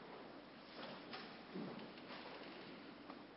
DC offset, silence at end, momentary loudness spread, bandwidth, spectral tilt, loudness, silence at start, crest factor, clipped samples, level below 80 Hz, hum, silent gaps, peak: under 0.1%; 0 s; 5 LU; 5.6 kHz; -3 dB/octave; -53 LUFS; 0 s; 16 dB; under 0.1%; -82 dBFS; none; none; -38 dBFS